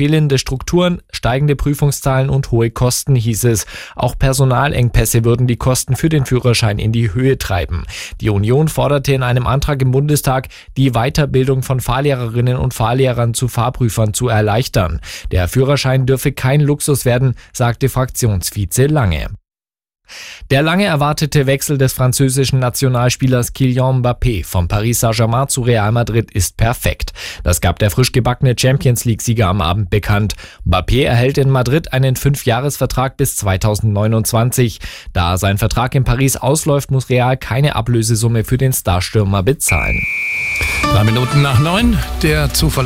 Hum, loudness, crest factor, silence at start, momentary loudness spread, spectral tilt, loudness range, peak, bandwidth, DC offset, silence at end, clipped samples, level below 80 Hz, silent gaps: none; -15 LUFS; 12 dB; 0 s; 5 LU; -5.5 dB/octave; 2 LU; -2 dBFS; 16.5 kHz; 0.2%; 0 s; under 0.1%; -28 dBFS; none